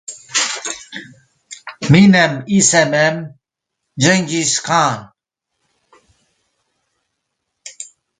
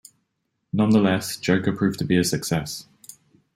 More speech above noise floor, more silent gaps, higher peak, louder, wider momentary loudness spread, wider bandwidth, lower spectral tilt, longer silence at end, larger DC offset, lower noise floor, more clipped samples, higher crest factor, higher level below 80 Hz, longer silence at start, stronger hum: first, 64 dB vs 54 dB; neither; first, 0 dBFS vs -6 dBFS; first, -14 LUFS vs -22 LUFS; first, 23 LU vs 10 LU; second, 9.6 kHz vs 16 kHz; second, -4 dB/octave vs -5.5 dB/octave; second, 0.35 s vs 0.75 s; neither; about the same, -78 dBFS vs -75 dBFS; neither; about the same, 18 dB vs 18 dB; about the same, -52 dBFS vs -56 dBFS; second, 0.1 s vs 0.75 s; neither